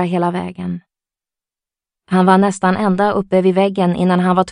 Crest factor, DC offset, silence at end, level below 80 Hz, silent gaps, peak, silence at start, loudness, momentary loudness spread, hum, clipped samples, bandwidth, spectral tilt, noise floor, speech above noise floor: 16 dB; under 0.1%; 0 s; -54 dBFS; none; 0 dBFS; 0 s; -15 LUFS; 12 LU; none; under 0.1%; 10.5 kHz; -7 dB/octave; -89 dBFS; 74 dB